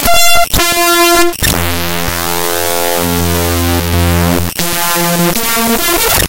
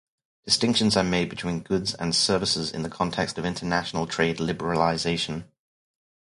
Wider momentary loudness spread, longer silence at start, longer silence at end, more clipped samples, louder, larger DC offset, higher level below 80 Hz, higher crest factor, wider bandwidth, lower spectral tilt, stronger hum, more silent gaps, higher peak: about the same, 6 LU vs 8 LU; second, 0 s vs 0.45 s; second, 0 s vs 0.85 s; first, 0.2% vs under 0.1%; first, -10 LUFS vs -25 LUFS; neither; first, -26 dBFS vs -50 dBFS; second, 10 dB vs 20 dB; first, over 20 kHz vs 11.5 kHz; about the same, -3 dB/octave vs -4 dB/octave; neither; neither; first, 0 dBFS vs -6 dBFS